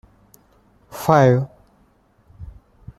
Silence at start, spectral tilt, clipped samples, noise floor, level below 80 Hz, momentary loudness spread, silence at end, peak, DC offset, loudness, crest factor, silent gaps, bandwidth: 0.95 s; -7.5 dB/octave; under 0.1%; -58 dBFS; -48 dBFS; 28 LU; 0.55 s; -2 dBFS; under 0.1%; -17 LUFS; 20 dB; none; 15 kHz